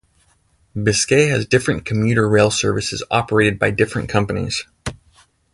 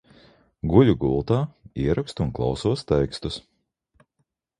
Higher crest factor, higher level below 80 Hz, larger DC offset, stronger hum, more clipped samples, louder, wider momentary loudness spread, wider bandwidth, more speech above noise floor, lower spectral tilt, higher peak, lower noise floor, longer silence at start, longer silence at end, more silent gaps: about the same, 18 dB vs 22 dB; about the same, -42 dBFS vs -40 dBFS; neither; neither; neither; first, -17 LUFS vs -23 LUFS; second, 10 LU vs 14 LU; about the same, 11.5 kHz vs 11 kHz; second, 42 dB vs 53 dB; second, -4.5 dB/octave vs -7.5 dB/octave; about the same, 0 dBFS vs -2 dBFS; second, -59 dBFS vs -75 dBFS; about the same, 0.75 s vs 0.65 s; second, 0.6 s vs 1.2 s; neither